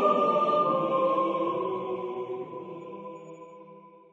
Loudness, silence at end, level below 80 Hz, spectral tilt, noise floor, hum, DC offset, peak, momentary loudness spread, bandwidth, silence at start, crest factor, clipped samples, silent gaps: -27 LUFS; 0.15 s; -80 dBFS; -7.5 dB/octave; -51 dBFS; none; under 0.1%; -12 dBFS; 20 LU; 7.4 kHz; 0 s; 16 dB; under 0.1%; none